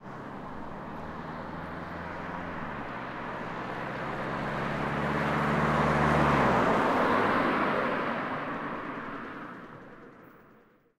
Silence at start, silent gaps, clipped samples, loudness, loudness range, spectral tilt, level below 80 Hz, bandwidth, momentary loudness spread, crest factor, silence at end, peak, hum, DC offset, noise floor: 0 s; none; under 0.1%; -30 LUFS; 12 LU; -6.5 dB/octave; -50 dBFS; 15 kHz; 16 LU; 18 dB; 0.55 s; -12 dBFS; none; under 0.1%; -60 dBFS